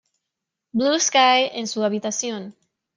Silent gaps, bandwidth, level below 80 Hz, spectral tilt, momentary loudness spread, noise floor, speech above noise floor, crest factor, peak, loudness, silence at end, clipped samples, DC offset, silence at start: none; 10.5 kHz; -72 dBFS; -2 dB/octave; 14 LU; -83 dBFS; 63 dB; 18 dB; -4 dBFS; -20 LUFS; 0.45 s; under 0.1%; under 0.1%; 0.75 s